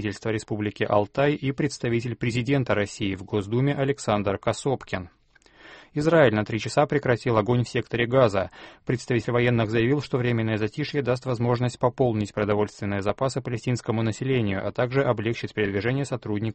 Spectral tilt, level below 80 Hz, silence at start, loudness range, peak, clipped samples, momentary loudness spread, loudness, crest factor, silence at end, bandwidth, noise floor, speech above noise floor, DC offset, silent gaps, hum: -6.5 dB/octave; -52 dBFS; 0 s; 3 LU; -6 dBFS; under 0.1%; 7 LU; -25 LUFS; 18 dB; 0 s; 8.8 kHz; -54 dBFS; 30 dB; under 0.1%; none; none